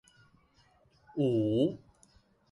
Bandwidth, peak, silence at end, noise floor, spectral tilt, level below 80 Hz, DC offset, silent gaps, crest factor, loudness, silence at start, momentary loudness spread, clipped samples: 11 kHz; -16 dBFS; 0.75 s; -66 dBFS; -9 dB/octave; -66 dBFS; under 0.1%; none; 18 dB; -31 LUFS; 1.15 s; 15 LU; under 0.1%